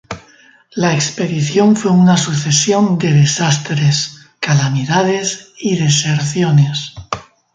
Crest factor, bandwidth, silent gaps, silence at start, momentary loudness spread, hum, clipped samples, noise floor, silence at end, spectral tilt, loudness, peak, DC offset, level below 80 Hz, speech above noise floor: 14 dB; 9.4 kHz; none; 0.1 s; 13 LU; none; under 0.1%; -47 dBFS; 0.35 s; -5 dB/octave; -14 LUFS; 0 dBFS; under 0.1%; -50 dBFS; 33 dB